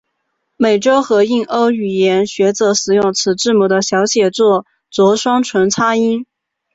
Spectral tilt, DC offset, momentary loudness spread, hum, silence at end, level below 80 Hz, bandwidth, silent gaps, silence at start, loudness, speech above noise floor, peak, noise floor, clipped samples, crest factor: -4 dB/octave; under 0.1%; 3 LU; none; 0.5 s; -58 dBFS; 8 kHz; none; 0.6 s; -14 LUFS; 57 dB; -2 dBFS; -70 dBFS; under 0.1%; 12 dB